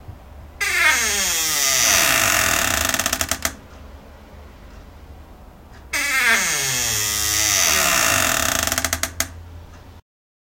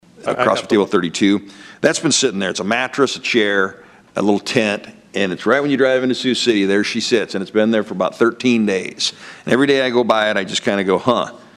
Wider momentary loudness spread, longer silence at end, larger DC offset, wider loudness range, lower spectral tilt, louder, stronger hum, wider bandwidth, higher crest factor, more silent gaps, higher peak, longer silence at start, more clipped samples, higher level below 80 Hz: first, 9 LU vs 6 LU; first, 0.4 s vs 0.2 s; neither; first, 8 LU vs 1 LU; second, -0.5 dB/octave vs -4 dB/octave; about the same, -17 LUFS vs -17 LUFS; neither; first, 17.5 kHz vs 12.5 kHz; about the same, 20 dB vs 18 dB; neither; about the same, 0 dBFS vs 0 dBFS; second, 0 s vs 0.2 s; neither; first, -42 dBFS vs -62 dBFS